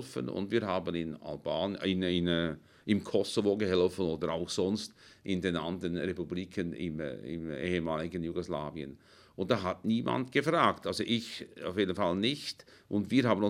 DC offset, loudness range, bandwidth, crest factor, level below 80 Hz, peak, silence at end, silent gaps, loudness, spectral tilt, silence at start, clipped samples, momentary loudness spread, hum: under 0.1%; 5 LU; 15.5 kHz; 22 dB; -66 dBFS; -10 dBFS; 0 s; none; -33 LUFS; -5.5 dB/octave; 0 s; under 0.1%; 11 LU; none